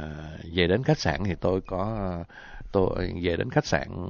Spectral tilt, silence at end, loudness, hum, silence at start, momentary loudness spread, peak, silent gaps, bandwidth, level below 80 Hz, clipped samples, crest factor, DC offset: -6 dB/octave; 0 s; -27 LUFS; none; 0 s; 14 LU; -8 dBFS; none; 7 kHz; -40 dBFS; under 0.1%; 20 dB; under 0.1%